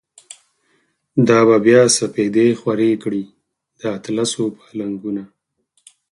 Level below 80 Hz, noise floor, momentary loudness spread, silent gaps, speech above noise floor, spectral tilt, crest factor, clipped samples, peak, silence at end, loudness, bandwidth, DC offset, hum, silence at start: -62 dBFS; -66 dBFS; 16 LU; none; 50 dB; -4.5 dB/octave; 18 dB; under 0.1%; 0 dBFS; 0.85 s; -17 LUFS; 11.5 kHz; under 0.1%; none; 1.15 s